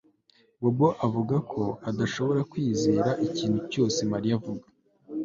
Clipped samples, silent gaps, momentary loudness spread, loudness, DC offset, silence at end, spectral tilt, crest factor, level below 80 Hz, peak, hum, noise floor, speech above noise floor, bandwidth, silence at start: under 0.1%; none; 7 LU; -27 LUFS; under 0.1%; 0 s; -6.5 dB/octave; 18 dB; -60 dBFS; -10 dBFS; none; -64 dBFS; 38 dB; 7.6 kHz; 0.6 s